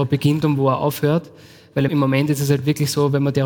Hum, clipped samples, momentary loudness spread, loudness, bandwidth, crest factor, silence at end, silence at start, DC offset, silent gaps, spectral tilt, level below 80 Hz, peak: none; under 0.1%; 3 LU; -19 LUFS; 17.5 kHz; 16 dB; 0 s; 0 s; under 0.1%; none; -6.5 dB/octave; -54 dBFS; -2 dBFS